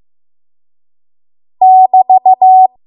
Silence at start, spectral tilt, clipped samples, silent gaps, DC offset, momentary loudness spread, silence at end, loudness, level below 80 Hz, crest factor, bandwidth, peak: 1.6 s; -9 dB/octave; under 0.1%; none; under 0.1%; 2 LU; 0.2 s; -7 LUFS; -70 dBFS; 10 dB; 1.1 kHz; 0 dBFS